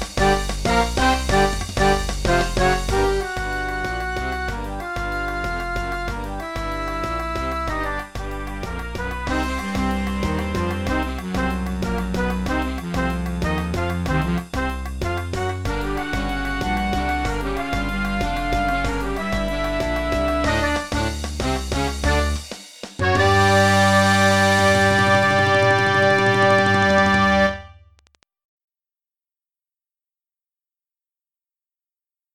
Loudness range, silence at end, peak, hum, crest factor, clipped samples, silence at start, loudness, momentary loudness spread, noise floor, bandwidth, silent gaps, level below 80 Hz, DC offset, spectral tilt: 10 LU; 4.5 s; -4 dBFS; none; 18 dB; under 0.1%; 0 s; -21 LUFS; 11 LU; under -90 dBFS; 18.5 kHz; none; -30 dBFS; 0.5%; -5 dB/octave